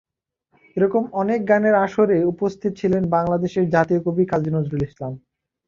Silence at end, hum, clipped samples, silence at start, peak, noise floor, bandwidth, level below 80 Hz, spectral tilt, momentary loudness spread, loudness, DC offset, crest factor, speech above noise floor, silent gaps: 0.5 s; none; under 0.1%; 0.75 s; -2 dBFS; -70 dBFS; 7.4 kHz; -52 dBFS; -8.5 dB/octave; 9 LU; -20 LUFS; under 0.1%; 18 dB; 50 dB; none